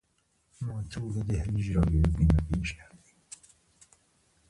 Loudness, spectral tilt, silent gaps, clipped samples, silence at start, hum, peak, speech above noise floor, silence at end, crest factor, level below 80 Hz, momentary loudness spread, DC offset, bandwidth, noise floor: -29 LUFS; -7.5 dB/octave; none; under 0.1%; 0.6 s; none; -10 dBFS; 45 dB; 1.65 s; 20 dB; -36 dBFS; 23 LU; under 0.1%; 11.5 kHz; -72 dBFS